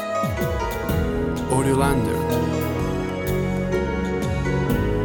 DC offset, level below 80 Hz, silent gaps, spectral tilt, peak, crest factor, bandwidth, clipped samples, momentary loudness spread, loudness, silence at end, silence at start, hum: under 0.1%; -32 dBFS; none; -6.5 dB/octave; -6 dBFS; 16 dB; 17.5 kHz; under 0.1%; 5 LU; -23 LUFS; 0 s; 0 s; none